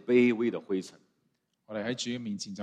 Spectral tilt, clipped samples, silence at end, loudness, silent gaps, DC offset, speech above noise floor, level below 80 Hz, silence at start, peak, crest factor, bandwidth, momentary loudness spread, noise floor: -5 dB/octave; under 0.1%; 0 s; -31 LUFS; none; under 0.1%; 47 dB; -76 dBFS; 0.05 s; -12 dBFS; 18 dB; 10.5 kHz; 14 LU; -76 dBFS